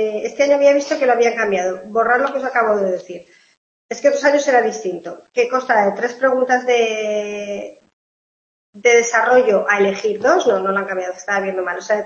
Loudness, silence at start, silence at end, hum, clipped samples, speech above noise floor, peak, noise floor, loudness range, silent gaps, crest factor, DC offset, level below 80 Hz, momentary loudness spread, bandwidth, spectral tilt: -17 LUFS; 0 s; 0 s; none; under 0.1%; over 73 dB; -2 dBFS; under -90 dBFS; 3 LU; 3.57-3.89 s, 7.93-8.73 s; 16 dB; under 0.1%; -66 dBFS; 12 LU; 7.6 kHz; -3.5 dB/octave